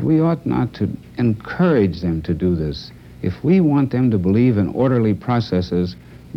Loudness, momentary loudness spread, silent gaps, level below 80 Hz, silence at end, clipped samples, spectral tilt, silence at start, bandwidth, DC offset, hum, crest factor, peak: -19 LUFS; 10 LU; none; -42 dBFS; 0 s; under 0.1%; -9.5 dB/octave; 0 s; 6.2 kHz; under 0.1%; none; 12 dB; -6 dBFS